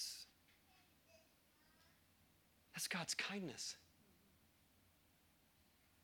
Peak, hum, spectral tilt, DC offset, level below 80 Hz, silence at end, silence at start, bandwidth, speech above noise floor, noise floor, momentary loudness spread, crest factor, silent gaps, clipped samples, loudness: -28 dBFS; none; -2 dB/octave; under 0.1%; -86 dBFS; 1.9 s; 0 s; 19.5 kHz; 28 dB; -75 dBFS; 15 LU; 26 dB; none; under 0.1%; -46 LUFS